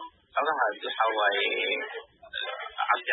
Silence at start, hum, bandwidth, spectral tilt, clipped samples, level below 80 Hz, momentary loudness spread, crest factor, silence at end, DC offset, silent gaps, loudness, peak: 0 s; none; 4.1 kHz; -5 dB/octave; under 0.1%; -74 dBFS; 11 LU; 20 dB; 0 s; under 0.1%; none; -28 LUFS; -8 dBFS